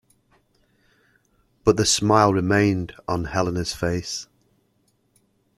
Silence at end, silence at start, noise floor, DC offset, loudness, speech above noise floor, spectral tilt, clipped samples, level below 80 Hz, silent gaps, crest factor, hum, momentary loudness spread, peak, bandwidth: 1.35 s; 1.65 s; -66 dBFS; under 0.1%; -21 LUFS; 45 dB; -4.5 dB/octave; under 0.1%; -48 dBFS; none; 22 dB; none; 11 LU; -2 dBFS; 13.5 kHz